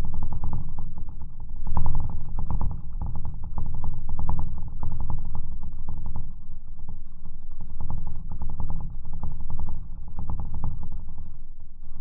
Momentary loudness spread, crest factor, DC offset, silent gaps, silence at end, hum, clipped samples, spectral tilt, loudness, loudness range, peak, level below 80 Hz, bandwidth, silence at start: 11 LU; 12 dB; under 0.1%; none; 0 s; none; under 0.1%; -12.5 dB/octave; -36 LUFS; 5 LU; -6 dBFS; -26 dBFS; 1.3 kHz; 0 s